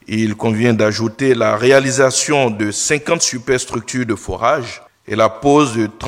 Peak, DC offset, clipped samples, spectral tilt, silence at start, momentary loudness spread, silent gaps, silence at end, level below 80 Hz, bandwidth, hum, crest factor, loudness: 0 dBFS; under 0.1%; under 0.1%; -4 dB/octave; 0.1 s; 9 LU; none; 0 s; -46 dBFS; 15.5 kHz; none; 14 dB; -15 LUFS